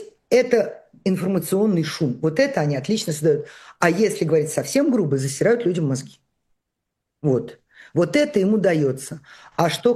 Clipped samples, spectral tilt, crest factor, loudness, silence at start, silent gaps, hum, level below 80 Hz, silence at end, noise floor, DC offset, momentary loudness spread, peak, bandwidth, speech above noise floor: under 0.1%; -5.5 dB/octave; 20 dB; -21 LUFS; 0 s; none; none; -64 dBFS; 0 s; -80 dBFS; under 0.1%; 9 LU; -2 dBFS; 13.5 kHz; 60 dB